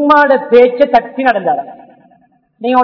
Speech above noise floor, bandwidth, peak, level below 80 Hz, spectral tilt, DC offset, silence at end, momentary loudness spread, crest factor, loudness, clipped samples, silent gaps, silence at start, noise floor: 41 dB; 5.4 kHz; 0 dBFS; -52 dBFS; -6.5 dB/octave; under 0.1%; 0 s; 12 LU; 12 dB; -11 LUFS; 1%; none; 0 s; -51 dBFS